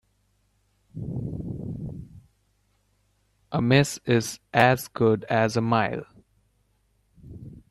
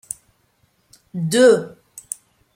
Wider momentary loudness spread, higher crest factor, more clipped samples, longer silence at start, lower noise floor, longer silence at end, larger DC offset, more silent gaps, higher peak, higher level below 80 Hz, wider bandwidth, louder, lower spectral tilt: first, 23 LU vs 20 LU; first, 26 dB vs 18 dB; neither; second, 0.95 s vs 1.15 s; first, -68 dBFS vs -63 dBFS; second, 0.1 s vs 0.85 s; neither; neither; about the same, -2 dBFS vs -2 dBFS; first, -54 dBFS vs -66 dBFS; second, 13.5 kHz vs 16.5 kHz; second, -24 LUFS vs -16 LUFS; about the same, -5.5 dB/octave vs -4.5 dB/octave